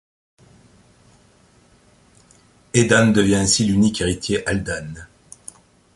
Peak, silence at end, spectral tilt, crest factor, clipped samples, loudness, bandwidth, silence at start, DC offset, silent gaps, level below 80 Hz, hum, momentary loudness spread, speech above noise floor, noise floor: -2 dBFS; 0.9 s; -4.5 dB/octave; 20 dB; under 0.1%; -18 LUFS; 11.5 kHz; 2.75 s; under 0.1%; none; -44 dBFS; 60 Hz at -45 dBFS; 25 LU; 37 dB; -54 dBFS